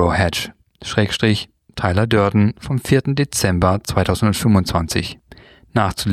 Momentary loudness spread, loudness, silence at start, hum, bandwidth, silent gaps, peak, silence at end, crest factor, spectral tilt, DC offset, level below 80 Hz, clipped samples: 8 LU; -18 LUFS; 0 s; none; 15 kHz; none; -2 dBFS; 0 s; 16 dB; -5.5 dB/octave; under 0.1%; -38 dBFS; under 0.1%